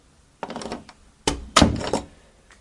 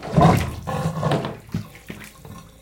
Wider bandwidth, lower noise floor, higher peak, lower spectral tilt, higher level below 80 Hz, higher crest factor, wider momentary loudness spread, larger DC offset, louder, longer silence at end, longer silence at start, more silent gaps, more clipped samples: second, 11.5 kHz vs 17 kHz; first, -52 dBFS vs -42 dBFS; about the same, 0 dBFS vs -2 dBFS; second, -4 dB/octave vs -7 dB/octave; about the same, -38 dBFS vs -40 dBFS; first, 26 dB vs 20 dB; second, 18 LU vs 23 LU; neither; about the same, -23 LUFS vs -22 LUFS; first, 0.55 s vs 0.2 s; first, 0.45 s vs 0 s; neither; neither